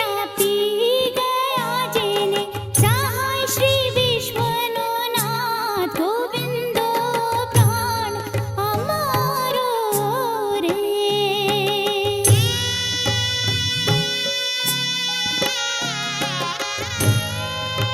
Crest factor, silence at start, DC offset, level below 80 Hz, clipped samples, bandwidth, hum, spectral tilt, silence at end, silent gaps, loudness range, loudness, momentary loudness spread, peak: 18 dB; 0 s; under 0.1%; -50 dBFS; under 0.1%; 16.5 kHz; none; -3.5 dB/octave; 0 s; none; 3 LU; -20 LUFS; 5 LU; -2 dBFS